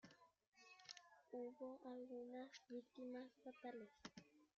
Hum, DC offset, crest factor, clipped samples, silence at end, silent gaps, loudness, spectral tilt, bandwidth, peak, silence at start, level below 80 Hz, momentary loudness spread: none; under 0.1%; 22 dB; under 0.1%; 0.1 s; 0.47-0.52 s; -57 LUFS; -3 dB/octave; 7.4 kHz; -36 dBFS; 0.05 s; under -90 dBFS; 8 LU